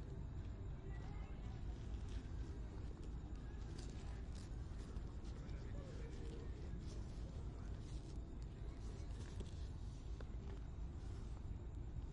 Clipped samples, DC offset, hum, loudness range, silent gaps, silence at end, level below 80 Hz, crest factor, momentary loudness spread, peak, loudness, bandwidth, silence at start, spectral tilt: under 0.1%; under 0.1%; none; 1 LU; none; 0 s; -50 dBFS; 12 dB; 2 LU; -36 dBFS; -52 LUFS; 10.5 kHz; 0 s; -7 dB/octave